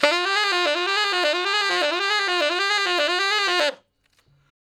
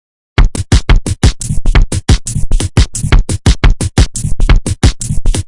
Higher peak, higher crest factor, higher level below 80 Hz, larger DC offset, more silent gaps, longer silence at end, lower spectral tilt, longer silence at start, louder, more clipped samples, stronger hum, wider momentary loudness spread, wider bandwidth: about the same, 0 dBFS vs 0 dBFS; first, 22 dB vs 10 dB; second, -80 dBFS vs -12 dBFS; neither; neither; first, 1.05 s vs 0 s; second, 0.5 dB/octave vs -4.5 dB/octave; second, 0 s vs 0.4 s; second, -20 LUFS vs -13 LUFS; second, under 0.1% vs 0.2%; neither; second, 1 LU vs 5 LU; first, 16.5 kHz vs 11.5 kHz